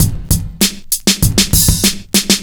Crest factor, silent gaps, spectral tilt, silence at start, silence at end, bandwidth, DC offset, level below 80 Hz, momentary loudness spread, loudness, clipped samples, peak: 14 dB; none; -3 dB/octave; 0 s; 0 s; over 20 kHz; under 0.1%; -22 dBFS; 5 LU; -12 LUFS; under 0.1%; 0 dBFS